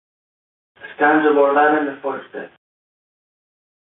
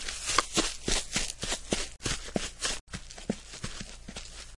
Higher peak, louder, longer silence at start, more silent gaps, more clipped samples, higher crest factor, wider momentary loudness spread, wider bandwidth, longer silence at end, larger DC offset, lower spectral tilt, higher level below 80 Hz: first, -2 dBFS vs -6 dBFS; first, -16 LUFS vs -32 LUFS; first, 0.85 s vs 0 s; second, none vs 2.81-2.87 s; neither; second, 18 dB vs 28 dB; first, 20 LU vs 14 LU; second, 4 kHz vs 11.5 kHz; first, 1.45 s vs 0 s; second, under 0.1% vs 0.1%; first, -9.5 dB/octave vs -2 dB/octave; second, -70 dBFS vs -42 dBFS